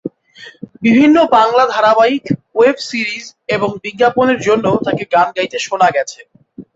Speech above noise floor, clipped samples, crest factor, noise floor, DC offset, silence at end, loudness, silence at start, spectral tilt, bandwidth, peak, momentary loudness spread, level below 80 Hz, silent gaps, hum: 26 dB; under 0.1%; 12 dB; -39 dBFS; under 0.1%; 0.1 s; -13 LUFS; 0.05 s; -5 dB/octave; 8 kHz; -2 dBFS; 11 LU; -54 dBFS; none; none